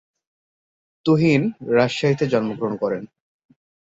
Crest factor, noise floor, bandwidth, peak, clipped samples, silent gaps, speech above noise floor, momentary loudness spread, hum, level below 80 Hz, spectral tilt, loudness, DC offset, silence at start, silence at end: 16 dB; under -90 dBFS; 7.8 kHz; -6 dBFS; under 0.1%; none; over 71 dB; 9 LU; none; -60 dBFS; -7 dB/octave; -20 LUFS; under 0.1%; 1.05 s; 0.9 s